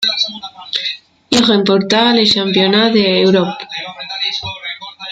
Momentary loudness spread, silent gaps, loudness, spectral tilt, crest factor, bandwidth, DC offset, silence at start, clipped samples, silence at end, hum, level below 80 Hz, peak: 14 LU; none; -13 LUFS; -4.5 dB/octave; 14 dB; 9.4 kHz; under 0.1%; 0 s; under 0.1%; 0 s; none; -52 dBFS; 0 dBFS